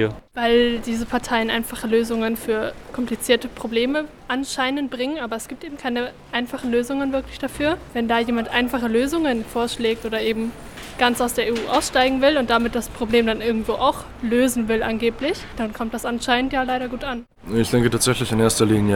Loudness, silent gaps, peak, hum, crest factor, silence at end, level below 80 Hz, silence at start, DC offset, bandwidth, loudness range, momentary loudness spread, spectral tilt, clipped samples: -22 LUFS; none; -2 dBFS; none; 20 dB; 0 s; -42 dBFS; 0 s; under 0.1%; 18 kHz; 5 LU; 9 LU; -4.5 dB/octave; under 0.1%